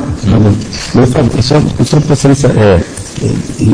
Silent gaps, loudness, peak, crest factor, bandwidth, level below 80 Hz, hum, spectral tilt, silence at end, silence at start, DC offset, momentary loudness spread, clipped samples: none; -10 LUFS; 0 dBFS; 8 dB; 10.5 kHz; -26 dBFS; none; -6.5 dB/octave; 0 s; 0 s; 1%; 7 LU; 0.1%